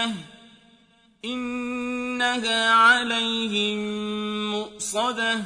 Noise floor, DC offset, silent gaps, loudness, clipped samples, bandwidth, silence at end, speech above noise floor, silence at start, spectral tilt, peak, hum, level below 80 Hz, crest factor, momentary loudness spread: -58 dBFS; under 0.1%; none; -23 LUFS; under 0.1%; 11 kHz; 0 s; 35 dB; 0 s; -2.5 dB/octave; -6 dBFS; none; -62 dBFS; 20 dB; 13 LU